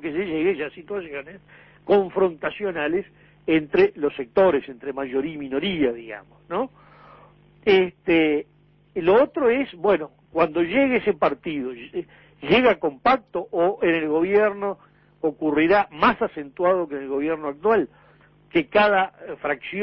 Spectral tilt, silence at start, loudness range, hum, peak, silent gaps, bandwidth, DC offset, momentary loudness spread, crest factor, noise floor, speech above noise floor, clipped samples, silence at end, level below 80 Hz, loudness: -8.5 dB/octave; 0 s; 3 LU; none; -6 dBFS; none; 5.8 kHz; under 0.1%; 13 LU; 16 dB; -54 dBFS; 32 dB; under 0.1%; 0 s; -56 dBFS; -22 LUFS